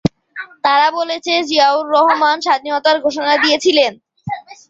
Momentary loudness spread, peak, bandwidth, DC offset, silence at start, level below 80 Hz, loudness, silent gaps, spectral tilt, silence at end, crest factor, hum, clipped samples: 15 LU; -2 dBFS; 8 kHz; under 0.1%; 0.05 s; -50 dBFS; -14 LUFS; none; -4 dB/octave; 0.15 s; 14 dB; none; under 0.1%